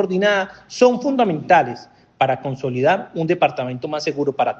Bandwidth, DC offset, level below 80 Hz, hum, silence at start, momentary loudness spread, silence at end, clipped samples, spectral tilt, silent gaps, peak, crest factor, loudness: 8.2 kHz; under 0.1%; -62 dBFS; none; 0 s; 9 LU; 0 s; under 0.1%; -5.5 dB/octave; none; 0 dBFS; 18 dB; -19 LUFS